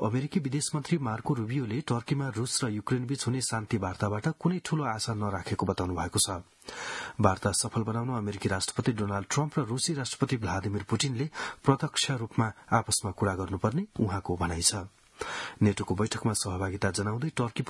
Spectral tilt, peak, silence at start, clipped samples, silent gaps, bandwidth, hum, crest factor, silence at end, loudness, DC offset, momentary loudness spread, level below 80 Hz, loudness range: -4.5 dB/octave; -6 dBFS; 0 s; under 0.1%; none; 12 kHz; none; 24 dB; 0 s; -30 LUFS; under 0.1%; 6 LU; -58 dBFS; 1 LU